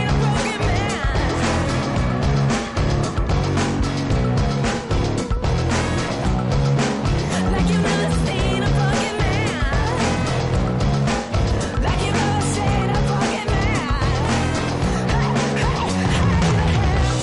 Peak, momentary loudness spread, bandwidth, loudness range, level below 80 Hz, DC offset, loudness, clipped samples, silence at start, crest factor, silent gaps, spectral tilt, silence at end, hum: -10 dBFS; 3 LU; 11.5 kHz; 1 LU; -26 dBFS; under 0.1%; -20 LUFS; under 0.1%; 0 s; 10 dB; none; -5.5 dB/octave; 0 s; none